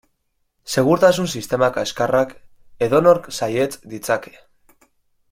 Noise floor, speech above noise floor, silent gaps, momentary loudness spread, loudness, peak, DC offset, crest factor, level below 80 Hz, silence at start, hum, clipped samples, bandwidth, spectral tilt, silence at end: -69 dBFS; 51 dB; none; 10 LU; -19 LUFS; -2 dBFS; under 0.1%; 18 dB; -56 dBFS; 0.65 s; none; under 0.1%; 16.5 kHz; -5 dB/octave; 1.05 s